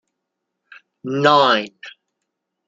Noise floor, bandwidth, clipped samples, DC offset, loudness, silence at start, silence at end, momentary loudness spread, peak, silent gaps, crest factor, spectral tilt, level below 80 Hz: -79 dBFS; 7.8 kHz; under 0.1%; under 0.1%; -16 LUFS; 1.05 s; 0.8 s; 20 LU; -2 dBFS; none; 20 dB; -5 dB/octave; -72 dBFS